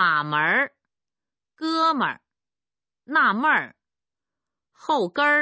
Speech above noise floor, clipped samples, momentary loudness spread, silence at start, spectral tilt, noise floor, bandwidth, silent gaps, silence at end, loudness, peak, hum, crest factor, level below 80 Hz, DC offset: over 68 dB; under 0.1%; 12 LU; 0 s; -5 dB/octave; under -90 dBFS; 8 kHz; none; 0 s; -22 LUFS; -8 dBFS; none; 18 dB; -80 dBFS; under 0.1%